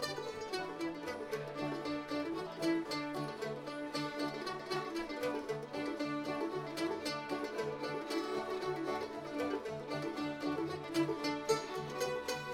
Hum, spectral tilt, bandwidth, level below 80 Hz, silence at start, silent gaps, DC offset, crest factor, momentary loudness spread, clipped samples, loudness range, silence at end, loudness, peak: none; -4.5 dB/octave; 17.5 kHz; -70 dBFS; 0 s; none; under 0.1%; 18 dB; 5 LU; under 0.1%; 1 LU; 0 s; -39 LUFS; -20 dBFS